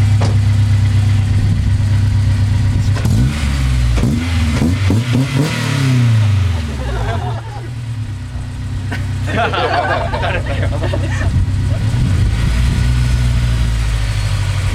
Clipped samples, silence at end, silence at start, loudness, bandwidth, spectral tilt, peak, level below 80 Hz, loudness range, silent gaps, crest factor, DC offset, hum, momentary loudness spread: under 0.1%; 0 s; 0 s; -16 LUFS; 13 kHz; -6.5 dB/octave; -2 dBFS; -20 dBFS; 5 LU; none; 10 dB; under 0.1%; none; 8 LU